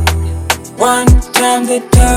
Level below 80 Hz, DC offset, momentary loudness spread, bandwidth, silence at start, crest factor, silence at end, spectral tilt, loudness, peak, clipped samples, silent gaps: -16 dBFS; under 0.1%; 7 LU; 17 kHz; 0 s; 10 dB; 0 s; -4.5 dB/octave; -12 LUFS; 0 dBFS; 0.1%; none